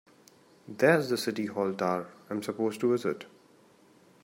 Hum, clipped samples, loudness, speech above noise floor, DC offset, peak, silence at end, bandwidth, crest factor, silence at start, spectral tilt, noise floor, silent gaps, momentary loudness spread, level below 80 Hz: none; under 0.1%; -29 LUFS; 31 dB; under 0.1%; -10 dBFS; 0.95 s; 16 kHz; 22 dB; 0.65 s; -5.5 dB/octave; -60 dBFS; none; 14 LU; -78 dBFS